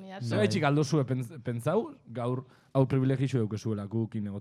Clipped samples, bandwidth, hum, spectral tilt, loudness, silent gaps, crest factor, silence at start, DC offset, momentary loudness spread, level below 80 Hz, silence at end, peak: under 0.1%; 13 kHz; none; -7 dB/octave; -30 LUFS; none; 18 dB; 0 s; under 0.1%; 8 LU; -66 dBFS; 0 s; -12 dBFS